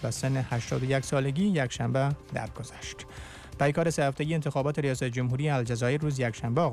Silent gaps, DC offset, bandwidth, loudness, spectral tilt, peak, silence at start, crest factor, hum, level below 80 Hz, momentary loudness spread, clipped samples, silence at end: none; under 0.1%; 13.5 kHz; -29 LUFS; -6 dB/octave; -16 dBFS; 0 s; 14 dB; none; -52 dBFS; 13 LU; under 0.1%; 0 s